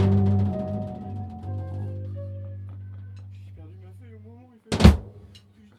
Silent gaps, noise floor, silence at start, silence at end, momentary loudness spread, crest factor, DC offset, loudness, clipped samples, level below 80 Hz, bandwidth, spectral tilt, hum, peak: none; -51 dBFS; 0 s; 0.4 s; 27 LU; 24 dB; under 0.1%; -25 LUFS; under 0.1%; -32 dBFS; 12.5 kHz; -7.5 dB/octave; none; 0 dBFS